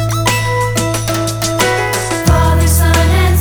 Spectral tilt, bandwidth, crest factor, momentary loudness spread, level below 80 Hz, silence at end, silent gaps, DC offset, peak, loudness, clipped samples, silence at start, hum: -4.5 dB/octave; over 20 kHz; 12 dB; 5 LU; -20 dBFS; 0 s; none; under 0.1%; 0 dBFS; -13 LUFS; under 0.1%; 0 s; none